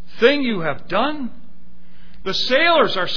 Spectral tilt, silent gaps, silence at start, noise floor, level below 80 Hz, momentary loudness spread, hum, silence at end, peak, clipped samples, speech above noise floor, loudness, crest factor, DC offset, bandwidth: -4.5 dB/octave; none; 0.15 s; -49 dBFS; -48 dBFS; 16 LU; none; 0 s; -2 dBFS; under 0.1%; 31 dB; -18 LUFS; 18 dB; 6%; 5.4 kHz